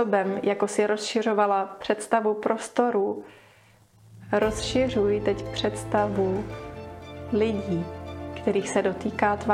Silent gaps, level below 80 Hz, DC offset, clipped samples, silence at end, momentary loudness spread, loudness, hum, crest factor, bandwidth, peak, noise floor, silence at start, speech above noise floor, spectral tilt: none; -50 dBFS; under 0.1%; under 0.1%; 0 s; 13 LU; -26 LUFS; none; 20 dB; 13 kHz; -6 dBFS; -56 dBFS; 0 s; 32 dB; -5 dB/octave